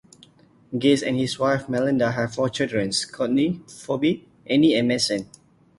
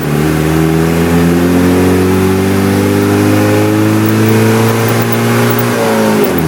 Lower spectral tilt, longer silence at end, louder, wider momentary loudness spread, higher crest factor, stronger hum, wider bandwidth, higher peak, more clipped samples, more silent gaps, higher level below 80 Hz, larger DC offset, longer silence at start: about the same, -5 dB/octave vs -6 dB/octave; first, 0.55 s vs 0 s; second, -22 LUFS vs -10 LUFS; first, 10 LU vs 2 LU; first, 16 dB vs 10 dB; neither; second, 11.5 kHz vs 18 kHz; second, -6 dBFS vs 0 dBFS; neither; neither; second, -58 dBFS vs -32 dBFS; neither; first, 0.7 s vs 0 s